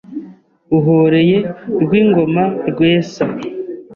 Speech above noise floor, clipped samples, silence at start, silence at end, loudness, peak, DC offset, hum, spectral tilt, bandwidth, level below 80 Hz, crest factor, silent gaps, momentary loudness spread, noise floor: 25 dB; under 0.1%; 0.1 s; 0 s; -14 LUFS; -2 dBFS; under 0.1%; none; -8 dB/octave; 7 kHz; -52 dBFS; 12 dB; none; 14 LU; -38 dBFS